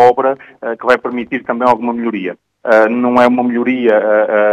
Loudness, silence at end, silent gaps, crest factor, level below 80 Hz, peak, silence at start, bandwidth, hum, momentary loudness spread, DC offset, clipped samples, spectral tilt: -13 LUFS; 0 s; none; 12 dB; -56 dBFS; 0 dBFS; 0 s; 8.8 kHz; none; 11 LU; under 0.1%; 0.3%; -6.5 dB/octave